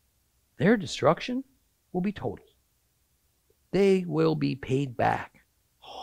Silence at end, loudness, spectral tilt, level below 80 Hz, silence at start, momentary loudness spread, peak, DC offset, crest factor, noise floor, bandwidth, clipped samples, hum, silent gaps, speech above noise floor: 0 s; -27 LUFS; -6.5 dB/octave; -58 dBFS; 0.6 s; 13 LU; -8 dBFS; under 0.1%; 22 dB; -71 dBFS; 14 kHz; under 0.1%; none; none; 45 dB